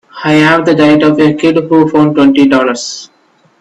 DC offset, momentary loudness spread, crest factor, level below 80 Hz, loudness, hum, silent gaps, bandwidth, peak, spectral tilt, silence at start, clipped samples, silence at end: under 0.1%; 8 LU; 8 dB; -48 dBFS; -8 LUFS; none; none; 8.8 kHz; 0 dBFS; -5.5 dB/octave; 0.15 s; under 0.1%; 0.55 s